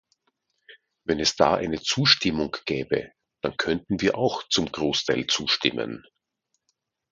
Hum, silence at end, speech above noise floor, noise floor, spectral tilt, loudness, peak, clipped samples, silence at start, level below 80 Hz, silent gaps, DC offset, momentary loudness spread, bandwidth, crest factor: none; 1.1 s; 53 dB; -78 dBFS; -3.5 dB/octave; -24 LUFS; -2 dBFS; under 0.1%; 0.7 s; -54 dBFS; none; under 0.1%; 11 LU; 9.6 kHz; 24 dB